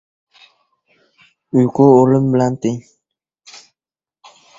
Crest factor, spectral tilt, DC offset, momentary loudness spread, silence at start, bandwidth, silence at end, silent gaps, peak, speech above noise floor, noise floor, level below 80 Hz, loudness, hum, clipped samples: 18 dB; -8.5 dB/octave; under 0.1%; 12 LU; 1.55 s; 7.6 kHz; 1.05 s; none; 0 dBFS; over 77 dB; under -90 dBFS; -56 dBFS; -14 LUFS; none; under 0.1%